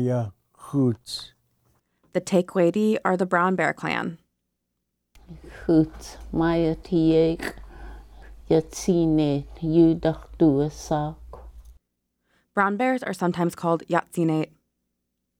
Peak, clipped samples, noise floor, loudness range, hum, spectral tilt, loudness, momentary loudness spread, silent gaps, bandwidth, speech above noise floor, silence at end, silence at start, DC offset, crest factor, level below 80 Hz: -6 dBFS; under 0.1%; -79 dBFS; 4 LU; none; -6.5 dB/octave; -24 LUFS; 14 LU; none; 15 kHz; 56 dB; 0.95 s; 0 s; under 0.1%; 18 dB; -46 dBFS